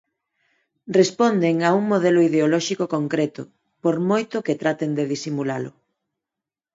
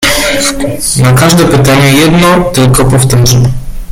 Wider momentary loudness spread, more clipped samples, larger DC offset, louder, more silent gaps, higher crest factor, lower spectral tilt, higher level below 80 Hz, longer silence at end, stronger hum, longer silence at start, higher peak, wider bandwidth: first, 10 LU vs 6 LU; second, under 0.1% vs 0.2%; neither; second, -21 LUFS vs -6 LUFS; neither; first, 18 dB vs 6 dB; first, -6 dB/octave vs -4.5 dB/octave; second, -70 dBFS vs -22 dBFS; first, 1.05 s vs 0 s; neither; first, 0.85 s vs 0 s; second, -4 dBFS vs 0 dBFS; second, 7.8 kHz vs 16.5 kHz